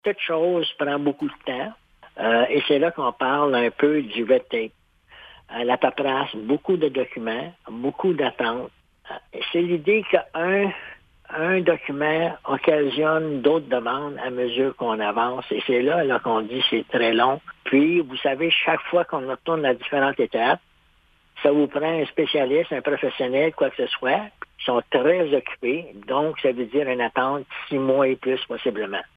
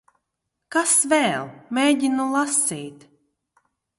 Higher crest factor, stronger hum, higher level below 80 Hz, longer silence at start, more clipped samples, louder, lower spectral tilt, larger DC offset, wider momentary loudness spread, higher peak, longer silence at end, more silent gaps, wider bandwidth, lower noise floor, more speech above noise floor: about the same, 20 dB vs 18 dB; neither; first, -64 dBFS vs -72 dBFS; second, 0.05 s vs 0.7 s; neither; about the same, -22 LUFS vs -20 LUFS; first, -7.5 dB/octave vs -2 dB/octave; neither; second, 9 LU vs 12 LU; first, -2 dBFS vs -6 dBFS; second, 0.1 s vs 1.05 s; neither; second, 5 kHz vs 12 kHz; second, -60 dBFS vs -80 dBFS; second, 37 dB vs 58 dB